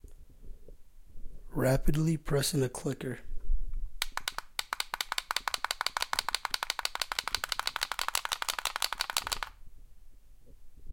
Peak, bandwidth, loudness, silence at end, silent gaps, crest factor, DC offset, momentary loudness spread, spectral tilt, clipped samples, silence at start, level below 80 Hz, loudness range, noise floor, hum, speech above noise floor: -6 dBFS; 17 kHz; -33 LUFS; 0 s; none; 26 dB; under 0.1%; 10 LU; -3.5 dB/octave; under 0.1%; 0.05 s; -40 dBFS; 2 LU; -51 dBFS; none; 22 dB